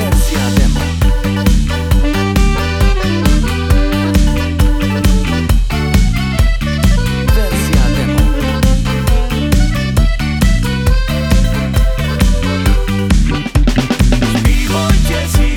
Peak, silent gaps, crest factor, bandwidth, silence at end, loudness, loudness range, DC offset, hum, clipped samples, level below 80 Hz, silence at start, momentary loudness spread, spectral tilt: 0 dBFS; none; 10 dB; 17 kHz; 0 s; -14 LUFS; 1 LU; under 0.1%; none; under 0.1%; -14 dBFS; 0 s; 2 LU; -5.5 dB/octave